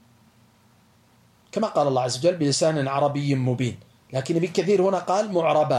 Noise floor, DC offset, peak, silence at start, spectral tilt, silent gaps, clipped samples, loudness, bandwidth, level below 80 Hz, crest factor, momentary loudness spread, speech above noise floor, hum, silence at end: -58 dBFS; under 0.1%; -8 dBFS; 1.55 s; -5.5 dB/octave; none; under 0.1%; -23 LUFS; 12.5 kHz; -68 dBFS; 16 dB; 8 LU; 36 dB; none; 0 s